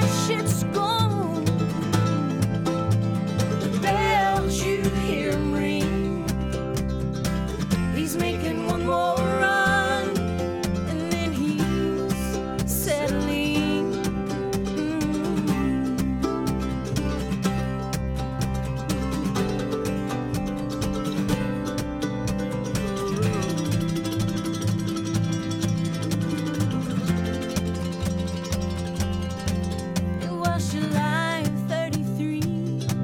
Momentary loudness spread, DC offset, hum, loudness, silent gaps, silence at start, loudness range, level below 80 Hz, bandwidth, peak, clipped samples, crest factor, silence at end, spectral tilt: 5 LU; under 0.1%; none; -25 LUFS; none; 0 s; 4 LU; -38 dBFS; 18 kHz; -8 dBFS; under 0.1%; 16 dB; 0 s; -5.5 dB/octave